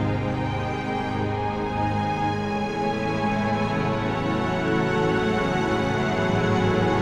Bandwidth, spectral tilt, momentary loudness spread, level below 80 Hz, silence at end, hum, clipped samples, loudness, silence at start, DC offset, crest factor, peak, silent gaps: 10.5 kHz; -6.5 dB/octave; 5 LU; -42 dBFS; 0 s; none; under 0.1%; -24 LUFS; 0 s; under 0.1%; 16 dB; -8 dBFS; none